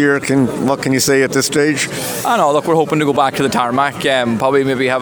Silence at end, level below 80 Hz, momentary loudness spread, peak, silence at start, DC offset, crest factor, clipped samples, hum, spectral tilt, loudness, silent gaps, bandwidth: 0 s; -52 dBFS; 3 LU; 0 dBFS; 0 s; under 0.1%; 14 dB; under 0.1%; none; -4 dB/octave; -14 LUFS; none; over 20 kHz